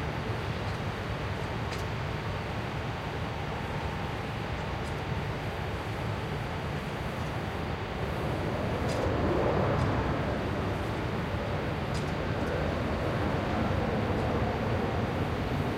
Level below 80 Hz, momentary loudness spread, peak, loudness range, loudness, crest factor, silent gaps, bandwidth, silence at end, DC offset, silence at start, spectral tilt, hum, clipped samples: -42 dBFS; 5 LU; -16 dBFS; 4 LU; -32 LUFS; 16 dB; none; 16 kHz; 0 s; under 0.1%; 0 s; -6.5 dB/octave; none; under 0.1%